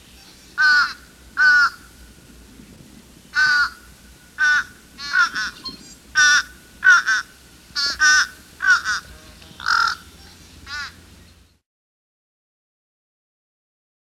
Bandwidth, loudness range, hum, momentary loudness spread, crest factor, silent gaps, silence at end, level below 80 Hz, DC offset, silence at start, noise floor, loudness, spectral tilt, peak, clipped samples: 15 kHz; 10 LU; none; 19 LU; 18 dB; none; 3.25 s; -52 dBFS; under 0.1%; 0.55 s; -50 dBFS; -17 LUFS; 1 dB/octave; -4 dBFS; under 0.1%